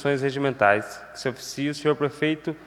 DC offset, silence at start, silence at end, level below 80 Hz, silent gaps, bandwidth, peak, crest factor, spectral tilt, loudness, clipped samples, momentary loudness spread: under 0.1%; 0 s; 0 s; -64 dBFS; none; 14.5 kHz; -4 dBFS; 22 dB; -5.5 dB/octave; -25 LUFS; under 0.1%; 10 LU